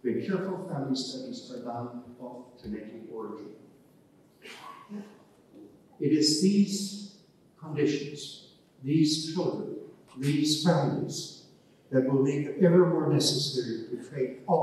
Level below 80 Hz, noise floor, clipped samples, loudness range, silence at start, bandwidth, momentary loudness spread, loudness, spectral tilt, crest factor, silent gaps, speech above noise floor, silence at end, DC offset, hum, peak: -72 dBFS; -60 dBFS; under 0.1%; 17 LU; 0.05 s; 13.5 kHz; 20 LU; -28 LUFS; -5.5 dB/octave; 20 dB; none; 32 dB; 0 s; under 0.1%; none; -10 dBFS